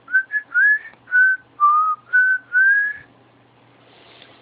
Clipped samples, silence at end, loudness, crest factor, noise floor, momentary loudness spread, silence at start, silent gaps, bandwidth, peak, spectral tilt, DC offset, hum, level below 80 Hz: under 0.1%; 1.45 s; -16 LUFS; 12 dB; -53 dBFS; 6 LU; 0.1 s; none; 4.5 kHz; -8 dBFS; -5 dB/octave; under 0.1%; none; -74 dBFS